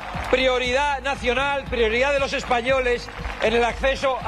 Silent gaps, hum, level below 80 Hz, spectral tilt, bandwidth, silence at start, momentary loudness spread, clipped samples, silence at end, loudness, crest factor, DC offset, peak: none; none; -36 dBFS; -4 dB/octave; 12 kHz; 0 s; 4 LU; under 0.1%; 0 s; -21 LUFS; 16 dB; under 0.1%; -6 dBFS